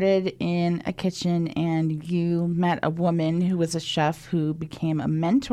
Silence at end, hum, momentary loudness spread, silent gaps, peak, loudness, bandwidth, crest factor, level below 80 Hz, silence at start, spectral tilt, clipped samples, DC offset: 0 s; none; 4 LU; none; -8 dBFS; -25 LUFS; 11.5 kHz; 16 dB; -56 dBFS; 0 s; -6.5 dB/octave; under 0.1%; under 0.1%